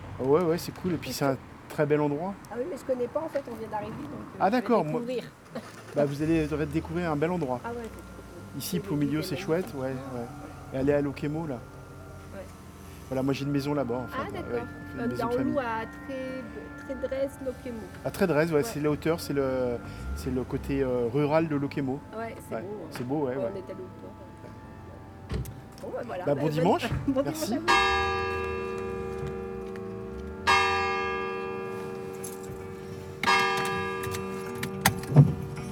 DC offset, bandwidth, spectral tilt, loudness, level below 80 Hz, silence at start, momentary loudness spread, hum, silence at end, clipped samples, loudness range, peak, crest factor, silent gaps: under 0.1%; over 20 kHz; -6 dB/octave; -29 LUFS; -50 dBFS; 0 s; 17 LU; none; 0 s; under 0.1%; 6 LU; -2 dBFS; 28 dB; none